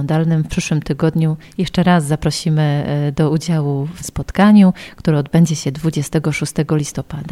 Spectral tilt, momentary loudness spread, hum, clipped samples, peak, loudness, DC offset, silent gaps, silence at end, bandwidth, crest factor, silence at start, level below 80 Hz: -6.5 dB/octave; 10 LU; none; under 0.1%; 0 dBFS; -16 LUFS; under 0.1%; none; 0 s; 13.5 kHz; 16 dB; 0 s; -38 dBFS